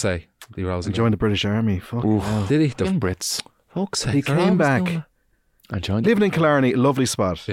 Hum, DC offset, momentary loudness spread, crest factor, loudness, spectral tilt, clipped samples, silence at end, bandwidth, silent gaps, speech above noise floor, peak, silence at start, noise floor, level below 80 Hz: none; under 0.1%; 11 LU; 14 dB; -21 LUFS; -5.5 dB/octave; under 0.1%; 0 s; 16.5 kHz; none; 44 dB; -8 dBFS; 0 s; -64 dBFS; -46 dBFS